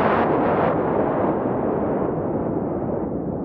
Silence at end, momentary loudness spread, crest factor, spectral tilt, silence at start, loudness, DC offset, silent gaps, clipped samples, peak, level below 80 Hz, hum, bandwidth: 0 s; 6 LU; 14 dB; -7.5 dB/octave; 0 s; -22 LUFS; under 0.1%; none; under 0.1%; -8 dBFS; -44 dBFS; none; 5.4 kHz